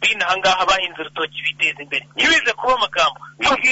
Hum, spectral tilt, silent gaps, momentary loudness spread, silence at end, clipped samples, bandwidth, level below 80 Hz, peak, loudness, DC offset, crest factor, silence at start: none; -1 dB/octave; none; 9 LU; 0 s; under 0.1%; 8 kHz; -50 dBFS; -6 dBFS; -18 LUFS; under 0.1%; 12 dB; 0 s